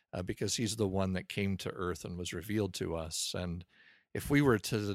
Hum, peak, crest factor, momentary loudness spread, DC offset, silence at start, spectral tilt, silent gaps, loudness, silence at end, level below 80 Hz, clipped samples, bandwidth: none; -14 dBFS; 20 dB; 11 LU; under 0.1%; 0.15 s; -5 dB/octave; none; -34 LUFS; 0 s; -56 dBFS; under 0.1%; 16 kHz